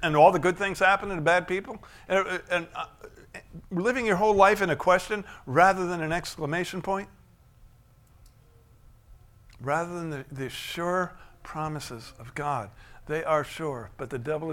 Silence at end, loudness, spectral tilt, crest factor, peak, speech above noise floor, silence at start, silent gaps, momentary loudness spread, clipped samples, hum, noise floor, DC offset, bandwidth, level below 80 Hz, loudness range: 0 s; -26 LUFS; -5 dB/octave; 22 dB; -6 dBFS; 30 dB; 0 s; none; 19 LU; under 0.1%; none; -57 dBFS; under 0.1%; 16.5 kHz; -52 dBFS; 12 LU